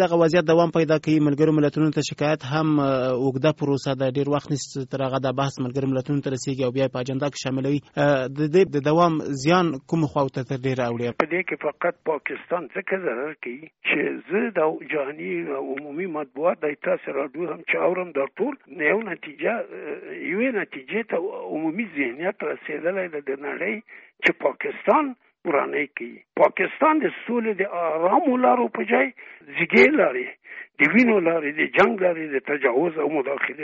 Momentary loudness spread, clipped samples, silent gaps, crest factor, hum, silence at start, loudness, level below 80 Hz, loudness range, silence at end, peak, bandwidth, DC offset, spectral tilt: 10 LU; under 0.1%; none; 18 dB; none; 0 s; -23 LUFS; -62 dBFS; 6 LU; 0 s; -4 dBFS; 8 kHz; under 0.1%; -5 dB/octave